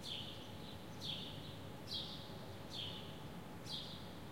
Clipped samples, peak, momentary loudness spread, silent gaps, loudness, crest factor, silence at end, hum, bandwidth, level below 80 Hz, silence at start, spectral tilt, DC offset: under 0.1%; -32 dBFS; 7 LU; none; -48 LUFS; 18 dB; 0 s; none; 16.5 kHz; -66 dBFS; 0 s; -4.5 dB/octave; 0.1%